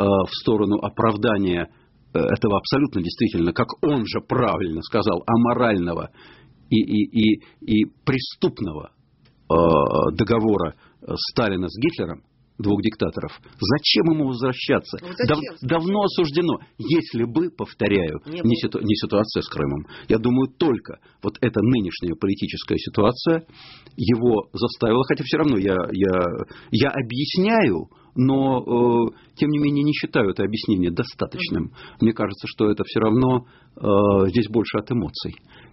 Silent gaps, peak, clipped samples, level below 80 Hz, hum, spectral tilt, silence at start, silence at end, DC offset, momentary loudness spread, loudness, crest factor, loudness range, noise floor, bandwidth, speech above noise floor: none; -2 dBFS; under 0.1%; -48 dBFS; none; -5.5 dB/octave; 0 s; 0.4 s; under 0.1%; 9 LU; -22 LUFS; 18 dB; 2 LU; -57 dBFS; 6 kHz; 36 dB